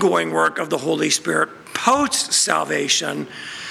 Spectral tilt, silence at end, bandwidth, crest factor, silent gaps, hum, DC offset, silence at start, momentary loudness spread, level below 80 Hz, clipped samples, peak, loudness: -2 dB/octave; 0 s; 16.5 kHz; 18 dB; none; none; under 0.1%; 0 s; 9 LU; -60 dBFS; under 0.1%; -2 dBFS; -19 LUFS